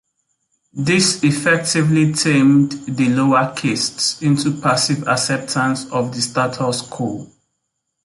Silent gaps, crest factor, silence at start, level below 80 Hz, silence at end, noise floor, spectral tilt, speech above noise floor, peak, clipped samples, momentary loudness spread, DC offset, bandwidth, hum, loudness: none; 14 dB; 0.75 s; -56 dBFS; 0.8 s; -74 dBFS; -4.5 dB/octave; 58 dB; -2 dBFS; under 0.1%; 8 LU; under 0.1%; 11.5 kHz; none; -17 LUFS